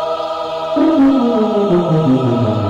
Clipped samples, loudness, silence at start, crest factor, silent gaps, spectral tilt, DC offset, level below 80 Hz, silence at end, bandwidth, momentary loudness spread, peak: under 0.1%; -14 LUFS; 0 s; 8 dB; none; -8.5 dB/octave; under 0.1%; -48 dBFS; 0 s; 7.8 kHz; 8 LU; -4 dBFS